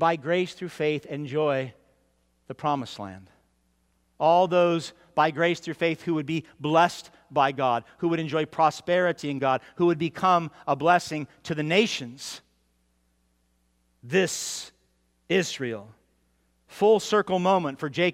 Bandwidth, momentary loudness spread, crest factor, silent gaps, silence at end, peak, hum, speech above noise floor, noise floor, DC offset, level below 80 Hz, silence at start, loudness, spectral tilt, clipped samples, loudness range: 16 kHz; 12 LU; 20 dB; none; 0 s; -6 dBFS; none; 44 dB; -69 dBFS; under 0.1%; -68 dBFS; 0 s; -25 LUFS; -5 dB/octave; under 0.1%; 6 LU